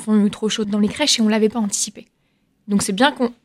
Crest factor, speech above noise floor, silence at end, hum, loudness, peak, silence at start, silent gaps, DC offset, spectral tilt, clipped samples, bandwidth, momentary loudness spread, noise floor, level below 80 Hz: 20 dB; 46 dB; 0.1 s; none; -18 LUFS; 0 dBFS; 0 s; none; under 0.1%; -3.5 dB/octave; under 0.1%; 14 kHz; 6 LU; -64 dBFS; -58 dBFS